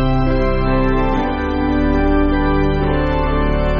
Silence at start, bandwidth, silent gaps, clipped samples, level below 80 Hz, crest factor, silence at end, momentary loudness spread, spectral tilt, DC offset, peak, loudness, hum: 0 s; 5.6 kHz; none; under 0.1%; -20 dBFS; 12 dB; 0 s; 2 LU; -6.5 dB/octave; under 0.1%; -4 dBFS; -17 LUFS; none